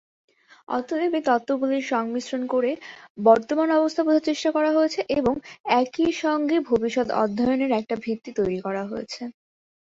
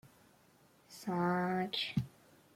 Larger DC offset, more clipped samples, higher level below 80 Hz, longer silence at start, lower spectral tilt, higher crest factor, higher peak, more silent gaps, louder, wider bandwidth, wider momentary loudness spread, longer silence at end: neither; neither; first, -60 dBFS vs -70 dBFS; first, 0.7 s vs 0.05 s; about the same, -5 dB/octave vs -6 dB/octave; about the same, 20 dB vs 18 dB; first, -4 dBFS vs -22 dBFS; first, 3.10-3.15 s, 5.60-5.64 s vs none; first, -23 LUFS vs -36 LUFS; second, 7.8 kHz vs 16 kHz; second, 9 LU vs 15 LU; about the same, 0.5 s vs 0.45 s